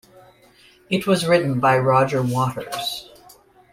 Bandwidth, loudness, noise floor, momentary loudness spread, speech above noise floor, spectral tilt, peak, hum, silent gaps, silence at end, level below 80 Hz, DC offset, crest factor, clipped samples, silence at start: 16 kHz; -20 LUFS; -53 dBFS; 10 LU; 33 dB; -5.5 dB/octave; -4 dBFS; none; none; 0.7 s; -56 dBFS; under 0.1%; 18 dB; under 0.1%; 0.9 s